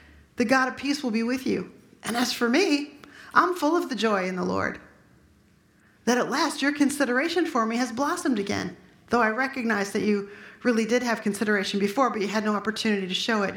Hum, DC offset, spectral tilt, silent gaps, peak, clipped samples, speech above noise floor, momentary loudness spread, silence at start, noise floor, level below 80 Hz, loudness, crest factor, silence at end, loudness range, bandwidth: none; under 0.1%; -4 dB/octave; none; -4 dBFS; under 0.1%; 35 dB; 7 LU; 0.4 s; -60 dBFS; -64 dBFS; -25 LUFS; 22 dB; 0 s; 2 LU; 18 kHz